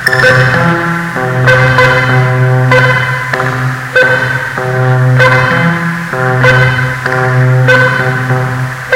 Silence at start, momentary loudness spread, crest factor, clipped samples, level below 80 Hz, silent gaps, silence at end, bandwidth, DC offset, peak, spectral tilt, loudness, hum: 0 s; 7 LU; 8 dB; 1%; -36 dBFS; none; 0 s; 14 kHz; under 0.1%; 0 dBFS; -6 dB/octave; -9 LUFS; none